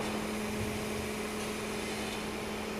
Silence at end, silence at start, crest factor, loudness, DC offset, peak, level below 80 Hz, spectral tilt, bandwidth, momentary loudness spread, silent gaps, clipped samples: 0 s; 0 s; 12 dB; -36 LUFS; under 0.1%; -24 dBFS; -52 dBFS; -4 dB/octave; 15.5 kHz; 2 LU; none; under 0.1%